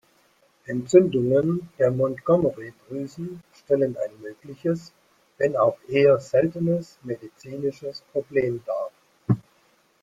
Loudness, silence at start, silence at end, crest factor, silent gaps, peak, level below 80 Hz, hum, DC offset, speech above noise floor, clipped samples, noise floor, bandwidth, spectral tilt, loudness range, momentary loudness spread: -24 LUFS; 0.7 s; 0.6 s; 20 dB; none; -4 dBFS; -62 dBFS; none; under 0.1%; 39 dB; under 0.1%; -62 dBFS; 9.4 kHz; -7.5 dB/octave; 5 LU; 18 LU